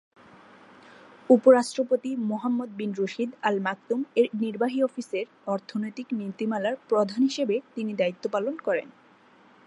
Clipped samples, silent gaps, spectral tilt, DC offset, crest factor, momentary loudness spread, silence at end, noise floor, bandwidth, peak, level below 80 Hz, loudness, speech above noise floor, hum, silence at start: under 0.1%; none; -5.5 dB/octave; under 0.1%; 22 dB; 11 LU; 0.8 s; -56 dBFS; 11 kHz; -6 dBFS; -82 dBFS; -26 LUFS; 31 dB; none; 1.3 s